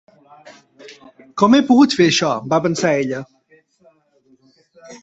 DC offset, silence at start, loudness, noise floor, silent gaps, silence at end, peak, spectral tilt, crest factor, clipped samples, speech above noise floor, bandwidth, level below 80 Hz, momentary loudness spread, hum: under 0.1%; 0.45 s; -15 LUFS; -57 dBFS; none; 0.05 s; -2 dBFS; -4.5 dB/octave; 16 dB; under 0.1%; 42 dB; 8 kHz; -60 dBFS; 12 LU; none